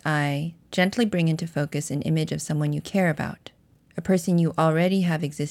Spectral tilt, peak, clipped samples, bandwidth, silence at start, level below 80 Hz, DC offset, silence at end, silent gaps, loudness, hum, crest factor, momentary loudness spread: -6 dB/octave; -8 dBFS; under 0.1%; 14 kHz; 0.05 s; -58 dBFS; under 0.1%; 0 s; none; -24 LUFS; none; 16 dB; 9 LU